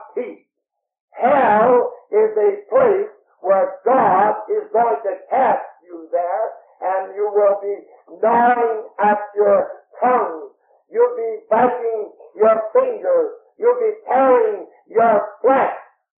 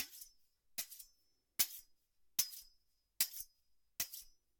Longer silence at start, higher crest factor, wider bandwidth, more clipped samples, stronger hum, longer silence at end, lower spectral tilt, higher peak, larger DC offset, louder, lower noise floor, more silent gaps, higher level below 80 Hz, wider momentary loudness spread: about the same, 0 s vs 0 s; second, 14 dB vs 30 dB; second, 3.7 kHz vs 17.5 kHz; neither; neither; about the same, 0.35 s vs 0.3 s; first, -5 dB/octave vs 2 dB/octave; first, -4 dBFS vs -16 dBFS; neither; first, -18 LUFS vs -40 LUFS; about the same, -79 dBFS vs -79 dBFS; first, 1.00-1.08 s vs none; first, -68 dBFS vs -76 dBFS; second, 13 LU vs 18 LU